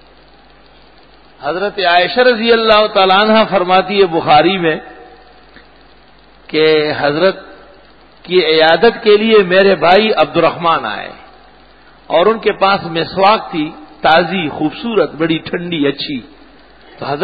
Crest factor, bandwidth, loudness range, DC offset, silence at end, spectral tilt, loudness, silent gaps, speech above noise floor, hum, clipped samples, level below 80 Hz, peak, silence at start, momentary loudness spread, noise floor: 14 dB; 5 kHz; 5 LU; 0.4%; 0 s; -7.5 dB/octave; -12 LUFS; none; 33 dB; none; under 0.1%; -48 dBFS; 0 dBFS; 1.4 s; 12 LU; -44 dBFS